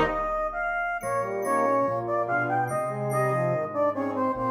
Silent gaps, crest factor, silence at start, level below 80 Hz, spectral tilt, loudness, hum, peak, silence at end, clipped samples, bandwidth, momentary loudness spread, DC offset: none; 14 dB; 0 s; -50 dBFS; -6.5 dB/octave; -26 LUFS; none; -12 dBFS; 0 s; under 0.1%; 13.5 kHz; 4 LU; under 0.1%